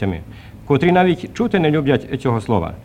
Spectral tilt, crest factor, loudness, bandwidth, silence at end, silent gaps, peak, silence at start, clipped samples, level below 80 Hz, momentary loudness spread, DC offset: -7.5 dB/octave; 16 dB; -17 LUFS; 10.5 kHz; 0 s; none; -2 dBFS; 0 s; under 0.1%; -42 dBFS; 14 LU; under 0.1%